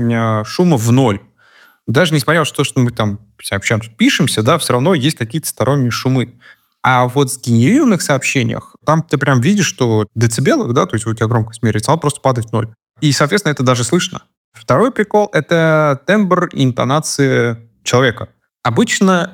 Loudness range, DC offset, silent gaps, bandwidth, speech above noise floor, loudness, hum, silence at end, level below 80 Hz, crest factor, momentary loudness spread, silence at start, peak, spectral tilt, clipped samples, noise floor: 2 LU; under 0.1%; 14.37-14.52 s; 17 kHz; 34 dB; -14 LUFS; none; 0.05 s; -50 dBFS; 14 dB; 8 LU; 0 s; -2 dBFS; -5 dB/octave; under 0.1%; -48 dBFS